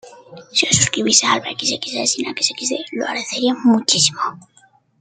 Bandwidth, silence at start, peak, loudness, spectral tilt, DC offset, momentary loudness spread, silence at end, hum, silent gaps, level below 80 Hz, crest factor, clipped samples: 10 kHz; 0.05 s; 0 dBFS; -17 LUFS; -2 dB/octave; under 0.1%; 10 LU; 0.65 s; none; none; -58 dBFS; 20 dB; under 0.1%